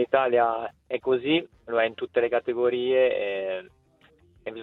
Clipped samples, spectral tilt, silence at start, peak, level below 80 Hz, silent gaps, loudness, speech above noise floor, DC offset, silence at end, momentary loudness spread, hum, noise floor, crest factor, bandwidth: under 0.1%; -7.5 dB/octave; 0 s; -8 dBFS; -66 dBFS; none; -25 LUFS; 35 dB; under 0.1%; 0 s; 10 LU; none; -60 dBFS; 18 dB; 4.2 kHz